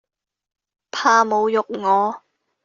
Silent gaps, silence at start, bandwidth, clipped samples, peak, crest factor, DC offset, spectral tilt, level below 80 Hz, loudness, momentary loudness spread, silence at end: none; 0.95 s; 7.4 kHz; under 0.1%; -2 dBFS; 18 dB; under 0.1%; -1.5 dB/octave; -70 dBFS; -18 LUFS; 12 LU; 0.45 s